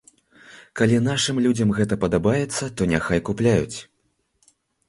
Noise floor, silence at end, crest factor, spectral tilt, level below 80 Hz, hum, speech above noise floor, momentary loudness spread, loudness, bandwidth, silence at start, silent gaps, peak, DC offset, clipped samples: -70 dBFS; 1.05 s; 18 dB; -5.5 dB/octave; -46 dBFS; none; 49 dB; 6 LU; -21 LUFS; 11.5 kHz; 0.5 s; none; -4 dBFS; under 0.1%; under 0.1%